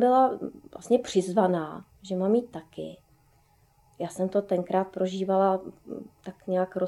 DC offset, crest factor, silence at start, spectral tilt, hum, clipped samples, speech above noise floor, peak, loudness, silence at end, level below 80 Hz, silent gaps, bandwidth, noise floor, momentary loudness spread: under 0.1%; 18 dB; 0 s; -6.5 dB/octave; none; under 0.1%; 36 dB; -8 dBFS; -27 LUFS; 0 s; -66 dBFS; none; 12.5 kHz; -63 dBFS; 17 LU